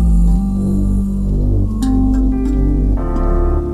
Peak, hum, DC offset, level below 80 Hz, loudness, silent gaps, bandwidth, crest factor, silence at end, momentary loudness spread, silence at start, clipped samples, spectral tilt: -4 dBFS; none; under 0.1%; -16 dBFS; -16 LUFS; none; 10 kHz; 10 dB; 0 s; 3 LU; 0 s; under 0.1%; -9.5 dB/octave